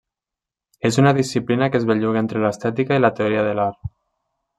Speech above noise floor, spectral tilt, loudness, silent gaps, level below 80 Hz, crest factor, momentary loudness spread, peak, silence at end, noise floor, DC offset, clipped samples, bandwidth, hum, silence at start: 69 dB; -6.5 dB/octave; -19 LUFS; none; -54 dBFS; 18 dB; 8 LU; -2 dBFS; 0.7 s; -87 dBFS; under 0.1%; under 0.1%; 12.5 kHz; none; 0.85 s